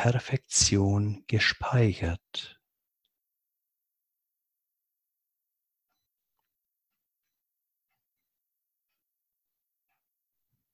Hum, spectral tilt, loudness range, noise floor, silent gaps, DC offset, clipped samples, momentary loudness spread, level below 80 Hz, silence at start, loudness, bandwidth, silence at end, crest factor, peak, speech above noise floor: none; -4 dB/octave; 16 LU; -85 dBFS; none; under 0.1%; under 0.1%; 14 LU; -50 dBFS; 0 s; -26 LUFS; 11.5 kHz; 8.25 s; 24 dB; -10 dBFS; 59 dB